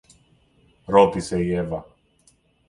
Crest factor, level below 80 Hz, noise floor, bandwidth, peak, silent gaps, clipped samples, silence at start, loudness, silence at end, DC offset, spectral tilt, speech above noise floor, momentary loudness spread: 20 dB; -48 dBFS; -61 dBFS; 11.5 kHz; -4 dBFS; none; under 0.1%; 0.9 s; -21 LUFS; 0.85 s; under 0.1%; -6.5 dB/octave; 41 dB; 13 LU